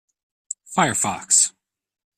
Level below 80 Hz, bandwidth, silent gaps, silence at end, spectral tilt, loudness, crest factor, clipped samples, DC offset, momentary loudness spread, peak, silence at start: -64 dBFS; 15.5 kHz; none; 0.7 s; -1.5 dB/octave; -19 LUFS; 22 dB; under 0.1%; under 0.1%; 16 LU; -2 dBFS; 0.7 s